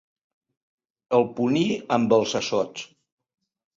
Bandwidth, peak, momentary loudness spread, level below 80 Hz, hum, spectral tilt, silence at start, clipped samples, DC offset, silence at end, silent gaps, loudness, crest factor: 7.6 kHz; -6 dBFS; 11 LU; -66 dBFS; none; -5 dB/octave; 1.1 s; under 0.1%; under 0.1%; 0.9 s; none; -23 LUFS; 20 dB